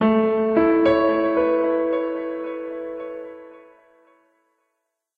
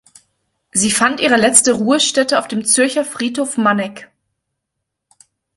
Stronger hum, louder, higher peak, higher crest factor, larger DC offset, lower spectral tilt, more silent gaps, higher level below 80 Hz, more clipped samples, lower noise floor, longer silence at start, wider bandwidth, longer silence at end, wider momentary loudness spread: neither; second, -21 LUFS vs -14 LUFS; second, -6 dBFS vs 0 dBFS; about the same, 16 dB vs 18 dB; neither; first, -8.5 dB/octave vs -2 dB/octave; neither; about the same, -54 dBFS vs -58 dBFS; neither; about the same, -77 dBFS vs -77 dBFS; second, 0 s vs 0.75 s; second, 4.8 kHz vs 16 kHz; about the same, 1.6 s vs 1.55 s; first, 16 LU vs 10 LU